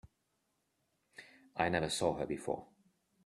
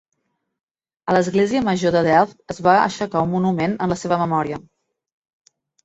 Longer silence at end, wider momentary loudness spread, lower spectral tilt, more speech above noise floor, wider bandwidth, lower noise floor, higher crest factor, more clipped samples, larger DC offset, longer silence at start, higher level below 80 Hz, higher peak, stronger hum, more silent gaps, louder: second, 0.6 s vs 1.25 s; first, 22 LU vs 7 LU; second, -4 dB/octave vs -6 dB/octave; second, 46 dB vs 55 dB; first, 13 kHz vs 8.2 kHz; first, -81 dBFS vs -73 dBFS; first, 26 dB vs 18 dB; neither; neither; second, 0.05 s vs 1.05 s; second, -66 dBFS vs -54 dBFS; second, -14 dBFS vs -2 dBFS; neither; neither; second, -36 LUFS vs -19 LUFS